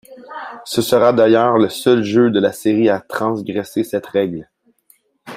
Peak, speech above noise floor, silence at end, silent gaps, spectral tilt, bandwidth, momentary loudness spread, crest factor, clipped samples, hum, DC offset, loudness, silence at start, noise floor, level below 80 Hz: -2 dBFS; 41 dB; 0 s; none; -5.5 dB/octave; 16 kHz; 16 LU; 16 dB; under 0.1%; none; under 0.1%; -16 LUFS; 0.1 s; -56 dBFS; -58 dBFS